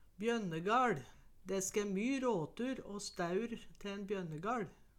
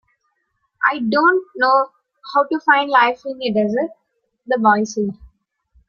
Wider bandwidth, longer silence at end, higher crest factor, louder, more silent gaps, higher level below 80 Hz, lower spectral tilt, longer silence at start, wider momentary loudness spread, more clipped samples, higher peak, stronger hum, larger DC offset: first, 16.5 kHz vs 7.2 kHz; second, 0.25 s vs 0.65 s; about the same, 16 dB vs 18 dB; second, -39 LUFS vs -17 LUFS; neither; second, -64 dBFS vs -58 dBFS; about the same, -4.5 dB/octave vs -5 dB/octave; second, 0.05 s vs 0.8 s; first, 12 LU vs 9 LU; neither; second, -22 dBFS vs 0 dBFS; neither; neither